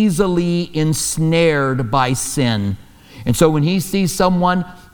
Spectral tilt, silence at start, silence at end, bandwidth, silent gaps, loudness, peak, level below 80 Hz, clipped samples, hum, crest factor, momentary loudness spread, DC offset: -5 dB/octave; 0 s; 0.15 s; over 20 kHz; none; -17 LUFS; 0 dBFS; -38 dBFS; under 0.1%; none; 16 dB; 7 LU; under 0.1%